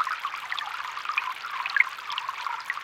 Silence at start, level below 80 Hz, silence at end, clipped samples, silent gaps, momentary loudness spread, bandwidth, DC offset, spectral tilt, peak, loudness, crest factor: 0 s; -78 dBFS; 0 s; under 0.1%; none; 9 LU; 17 kHz; under 0.1%; 1.5 dB/octave; -6 dBFS; -29 LUFS; 24 dB